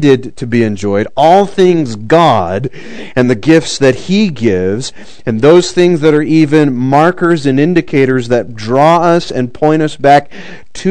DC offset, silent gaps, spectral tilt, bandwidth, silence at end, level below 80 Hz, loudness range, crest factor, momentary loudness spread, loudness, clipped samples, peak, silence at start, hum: 4%; none; -6 dB/octave; 12 kHz; 0 s; -44 dBFS; 2 LU; 10 dB; 11 LU; -10 LUFS; 2%; 0 dBFS; 0 s; none